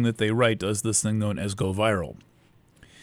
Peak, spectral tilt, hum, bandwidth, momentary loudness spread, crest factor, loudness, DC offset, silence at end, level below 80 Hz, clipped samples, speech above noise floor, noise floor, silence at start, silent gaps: -8 dBFS; -4.5 dB/octave; none; 16 kHz; 6 LU; 18 dB; -25 LUFS; under 0.1%; 0.8 s; -54 dBFS; under 0.1%; 34 dB; -59 dBFS; 0 s; none